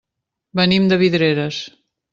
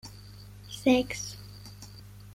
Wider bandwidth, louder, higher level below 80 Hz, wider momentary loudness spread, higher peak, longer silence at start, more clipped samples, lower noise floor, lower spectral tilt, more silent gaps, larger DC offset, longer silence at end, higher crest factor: second, 7.4 kHz vs 16 kHz; first, -17 LUFS vs -28 LUFS; about the same, -56 dBFS vs -54 dBFS; second, 13 LU vs 23 LU; first, -2 dBFS vs -12 dBFS; first, 0.55 s vs 0.05 s; neither; first, -81 dBFS vs -48 dBFS; first, -6.5 dB/octave vs -4.5 dB/octave; neither; neither; first, 0.45 s vs 0 s; about the same, 16 dB vs 20 dB